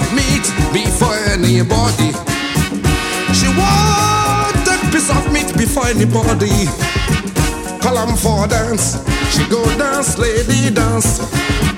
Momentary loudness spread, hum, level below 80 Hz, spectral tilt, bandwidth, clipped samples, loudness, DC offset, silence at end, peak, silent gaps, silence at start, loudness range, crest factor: 4 LU; none; -24 dBFS; -4.5 dB/octave; 17 kHz; under 0.1%; -14 LUFS; under 0.1%; 0 s; 0 dBFS; none; 0 s; 2 LU; 14 dB